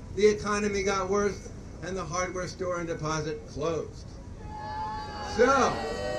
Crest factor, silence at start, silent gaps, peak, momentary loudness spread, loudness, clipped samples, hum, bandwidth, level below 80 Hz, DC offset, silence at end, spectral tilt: 20 dB; 0 s; none; -10 dBFS; 17 LU; -29 LUFS; under 0.1%; none; 10.5 kHz; -46 dBFS; under 0.1%; 0 s; -4.5 dB/octave